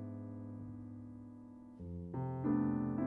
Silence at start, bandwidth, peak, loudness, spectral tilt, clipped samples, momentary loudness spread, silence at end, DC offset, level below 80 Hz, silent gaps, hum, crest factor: 0 s; 2.7 kHz; -24 dBFS; -41 LUFS; -12 dB/octave; under 0.1%; 18 LU; 0 s; under 0.1%; -64 dBFS; none; none; 16 dB